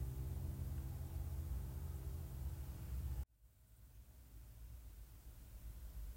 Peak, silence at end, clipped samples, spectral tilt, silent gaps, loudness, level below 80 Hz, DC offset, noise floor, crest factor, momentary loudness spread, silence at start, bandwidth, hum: -34 dBFS; 0 s; under 0.1%; -6.5 dB/octave; none; -50 LUFS; -50 dBFS; under 0.1%; -68 dBFS; 14 dB; 16 LU; 0 s; 16 kHz; none